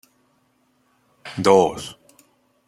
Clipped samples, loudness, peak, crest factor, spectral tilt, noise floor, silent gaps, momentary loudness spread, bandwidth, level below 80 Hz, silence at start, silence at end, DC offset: under 0.1%; -18 LUFS; -2 dBFS; 22 dB; -5 dB/octave; -64 dBFS; none; 21 LU; 13.5 kHz; -60 dBFS; 1.25 s; 0.75 s; under 0.1%